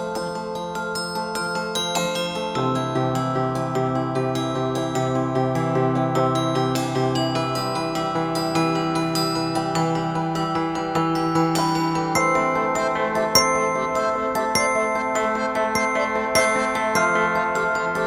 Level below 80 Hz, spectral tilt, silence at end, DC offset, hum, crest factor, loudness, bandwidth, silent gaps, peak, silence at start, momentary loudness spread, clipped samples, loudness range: -52 dBFS; -4.5 dB/octave; 0 s; under 0.1%; none; 20 dB; -22 LUFS; 19 kHz; none; -2 dBFS; 0 s; 5 LU; under 0.1%; 3 LU